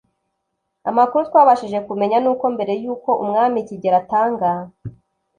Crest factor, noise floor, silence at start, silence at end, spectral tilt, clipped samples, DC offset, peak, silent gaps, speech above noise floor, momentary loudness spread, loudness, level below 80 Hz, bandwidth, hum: 18 dB; -75 dBFS; 0.85 s; 0.5 s; -7.5 dB/octave; under 0.1%; under 0.1%; -2 dBFS; none; 57 dB; 13 LU; -18 LUFS; -60 dBFS; 9.4 kHz; none